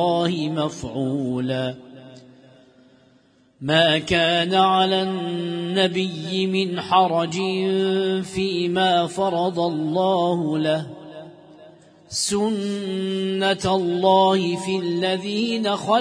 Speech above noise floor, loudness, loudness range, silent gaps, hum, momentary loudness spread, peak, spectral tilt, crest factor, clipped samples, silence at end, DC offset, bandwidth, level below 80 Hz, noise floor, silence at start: 36 dB; -21 LUFS; 5 LU; none; none; 9 LU; -4 dBFS; -5 dB/octave; 18 dB; under 0.1%; 0 s; under 0.1%; 10.5 kHz; -56 dBFS; -57 dBFS; 0 s